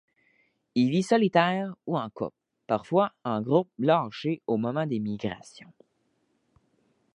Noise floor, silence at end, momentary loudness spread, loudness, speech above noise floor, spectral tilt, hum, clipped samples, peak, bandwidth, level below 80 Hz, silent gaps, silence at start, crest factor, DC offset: -72 dBFS; 1.65 s; 11 LU; -27 LUFS; 46 dB; -7 dB/octave; none; under 0.1%; -6 dBFS; 11 kHz; -68 dBFS; none; 0.75 s; 22 dB; under 0.1%